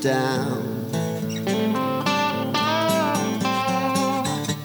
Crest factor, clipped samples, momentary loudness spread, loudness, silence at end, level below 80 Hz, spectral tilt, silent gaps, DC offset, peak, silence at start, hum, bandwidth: 14 dB; under 0.1%; 6 LU; -23 LUFS; 0 s; -62 dBFS; -4.5 dB/octave; none; under 0.1%; -8 dBFS; 0 s; none; over 20 kHz